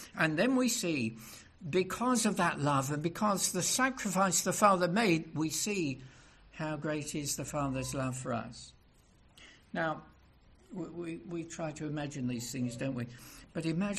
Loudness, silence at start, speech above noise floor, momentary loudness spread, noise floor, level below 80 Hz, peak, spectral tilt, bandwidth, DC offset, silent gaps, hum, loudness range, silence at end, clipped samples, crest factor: -32 LUFS; 0 s; 30 dB; 15 LU; -63 dBFS; -62 dBFS; -12 dBFS; -4 dB/octave; 14 kHz; under 0.1%; none; none; 11 LU; 0 s; under 0.1%; 22 dB